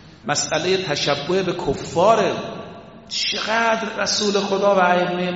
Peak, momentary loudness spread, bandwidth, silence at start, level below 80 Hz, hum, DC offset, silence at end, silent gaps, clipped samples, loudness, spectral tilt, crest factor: -2 dBFS; 9 LU; 8 kHz; 0.05 s; -50 dBFS; none; under 0.1%; 0 s; none; under 0.1%; -19 LUFS; -2.5 dB/octave; 18 dB